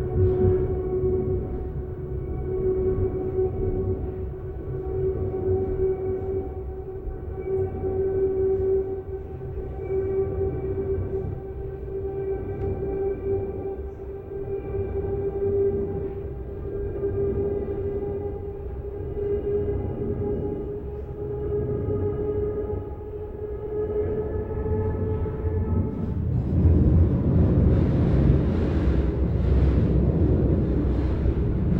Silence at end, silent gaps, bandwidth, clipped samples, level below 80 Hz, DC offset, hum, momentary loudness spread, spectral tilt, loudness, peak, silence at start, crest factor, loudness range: 0 s; none; 4.4 kHz; under 0.1%; -32 dBFS; under 0.1%; none; 12 LU; -11.5 dB/octave; -26 LUFS; -6 dBFS; 0 s; 18 dB; 8 LU